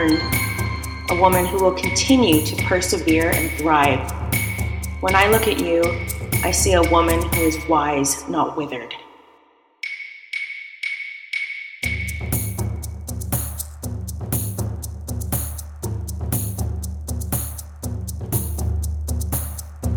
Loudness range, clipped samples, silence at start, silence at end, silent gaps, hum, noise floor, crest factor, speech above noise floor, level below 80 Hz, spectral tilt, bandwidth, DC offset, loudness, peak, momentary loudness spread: 9 LU; under 0.1%; 0 s; 0 s; none; none; -56 dBFS; 20 dB; 38 dB; -32 dBFS; -4.5 dB/octave; over 20 kHz; under 0.1%; -21 LUFS; 0 dBFS; 14 LU